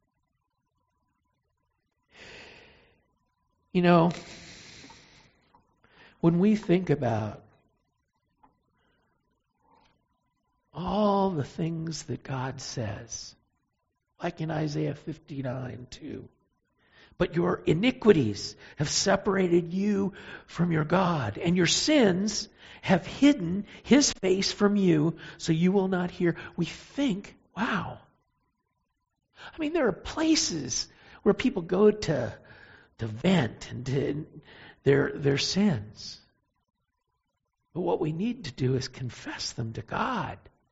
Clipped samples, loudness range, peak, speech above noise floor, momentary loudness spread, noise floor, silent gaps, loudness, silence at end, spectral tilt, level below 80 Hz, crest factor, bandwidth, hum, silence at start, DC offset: under 0.1%; 10 LU; -6 dBFS; 53 dB; 18 LU; -80 dBFS; none; -27 LUFS; 0.35 s; -5 dB/octave; -56 dBFS; 22 dB; 8 kHz; none; 2.2 s; under 0.1%